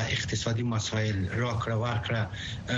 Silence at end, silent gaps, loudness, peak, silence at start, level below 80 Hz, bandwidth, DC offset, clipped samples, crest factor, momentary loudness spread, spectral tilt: 0 s; none; -30 LUFS; -14 dBFS; 0 s; -50 dBFS; 8 kHz; under 0.1%; under 0.1%; 14 dB; 2 LU; -5 dB/octave